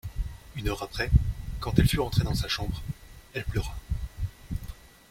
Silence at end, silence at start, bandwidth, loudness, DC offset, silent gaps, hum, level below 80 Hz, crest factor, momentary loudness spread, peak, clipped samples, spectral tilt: 0.25 s; 0.05 s; 16.5 kHz; -30 LUFS; under 0.1%; none; none; -34 dBFS; 24 dB; 14 LU; -4 dBFS; under 0.1%; -5.5 dB/octave